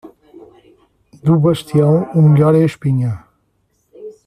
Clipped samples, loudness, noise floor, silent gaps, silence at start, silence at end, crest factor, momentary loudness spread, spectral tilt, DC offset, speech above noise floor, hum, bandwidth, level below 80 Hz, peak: under 0.1%; -14 LUFS; -63 dBFS; none; 0.05 s; 0.15 s; 14 dB; 12 LU; -9 dB/octave; under 0.1%; 51 dB; none; 10.5 kHz; -52 dBFS; -2 dBFS